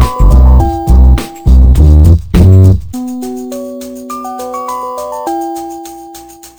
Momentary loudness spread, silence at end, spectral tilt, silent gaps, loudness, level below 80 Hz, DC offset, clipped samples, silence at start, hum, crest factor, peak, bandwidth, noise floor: 18 LU; 0.1 s; -8 dB/octave; none; -9 LUFS; -10 dBFS; under 0.1%; 1%; 0 s; none; 8 dB; 0 dBFS; over 20 kHz; -31 dBFS